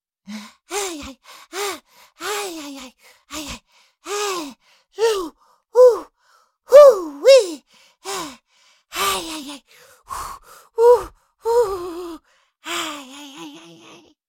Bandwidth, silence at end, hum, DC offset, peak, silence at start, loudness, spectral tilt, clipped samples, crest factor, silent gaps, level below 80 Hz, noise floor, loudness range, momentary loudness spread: 17 kHz; 0.7 s; none; under 0.1%; 0 dBFS; 0.3 s; -17 LUFS; -2 dB/octave; under 0.1%; 20 dB; none; -54 dBFS; -59 dBFS; 15 LU; 25 LU